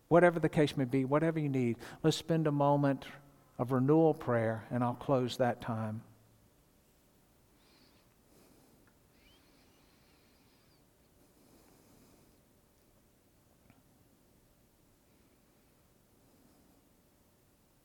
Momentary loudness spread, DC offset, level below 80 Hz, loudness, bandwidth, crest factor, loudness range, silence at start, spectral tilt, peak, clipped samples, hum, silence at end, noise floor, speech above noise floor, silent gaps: 13 LU; under 0.1%; -70 dBFS; -32 LUFS; 18.5 kHz; 24 dB; 10 LU; 0.1 s; -7 dB/octave; -12 dBFS; under 0.1%; none; 11.8 s; -68 dBFS; 38 dB; none